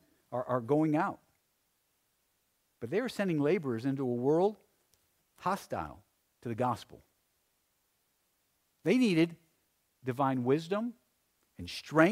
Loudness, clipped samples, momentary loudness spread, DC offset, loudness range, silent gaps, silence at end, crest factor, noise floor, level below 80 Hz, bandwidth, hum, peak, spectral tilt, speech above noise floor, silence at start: -32 LUFS; under 0.1%; 14 LU; under 0.1%; 7 LU; none; 0 s; 24 dB; -77 dBFS; -70 dBFS; 15.5 kHz; none; -10 dBFS; -7 dB/octave; 46 dB; 0.3 s